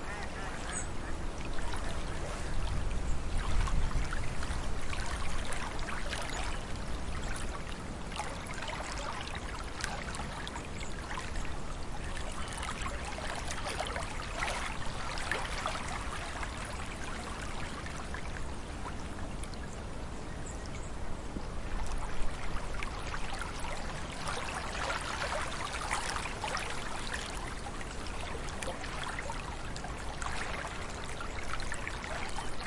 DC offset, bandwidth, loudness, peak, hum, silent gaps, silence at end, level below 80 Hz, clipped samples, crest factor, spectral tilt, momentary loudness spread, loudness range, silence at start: 0.1%; 11.5 kHz; -39 LUFS; -12 dBFS; none; none; 0 s; -40 dBFS; under 0.1%; 22 dB; -3.5 dB/octave; 7 LU; 5 LU; 0 s